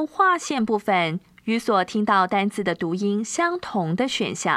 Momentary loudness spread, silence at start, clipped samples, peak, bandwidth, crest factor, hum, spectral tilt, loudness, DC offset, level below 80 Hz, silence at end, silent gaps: 6 LU; 0 s; under 0.1%; -6 dBFS; 13.5 kHz; 16 dB; none; -4.5 dB/octave; -23 LUFS; under 0.1%; -64 dBFS; 0 s; none